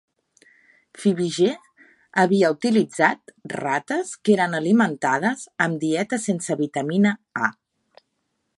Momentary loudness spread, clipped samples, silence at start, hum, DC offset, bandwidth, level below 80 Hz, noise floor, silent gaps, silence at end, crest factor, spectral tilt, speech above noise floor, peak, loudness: 7 LU; under 0.1%; 1 s; none; under 0.1%; 11.5 kHz; -70 dBFS; -74 dBFS; none; 1.1 s; 20 dB; -5.5 dB/octave; 53 dB; -4 dBFS; -22 LUFS